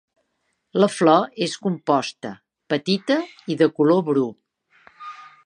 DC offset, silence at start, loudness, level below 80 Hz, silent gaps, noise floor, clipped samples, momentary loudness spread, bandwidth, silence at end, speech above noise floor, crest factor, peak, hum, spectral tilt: under 0.1%; 0.75 s; -21 LUFS; -74 dBFS; none; -73 dBFS; under 0.1%; 19 LU; 11 kHz; 0.2 s; 53 dB; 20 dB; -2 dBFS; none; -5.5 dB/octave